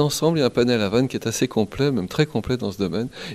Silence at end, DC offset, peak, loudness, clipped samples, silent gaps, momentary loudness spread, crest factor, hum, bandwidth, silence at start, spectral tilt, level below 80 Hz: 0 s; under 0.1%; -4 dBFS; -22 LUFS; under 0.1%; none; 6 LU; 18 dB; none; 15.5 kHz; 0 s; -5.5 dB/octave; -48 dBFS